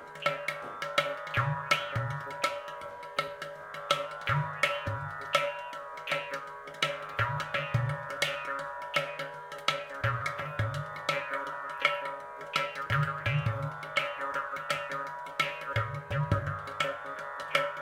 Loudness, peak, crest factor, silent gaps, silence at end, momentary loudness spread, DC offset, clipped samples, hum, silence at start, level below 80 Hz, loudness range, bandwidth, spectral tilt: -32 LUFS; -8 dBFS; 26 dB; none; 0 s; 9 LU; under 0.1%; under 0.1%; none; 0 s; -58 dBFS; 1 LU; 16.5 kHz; -4.5 dB/octave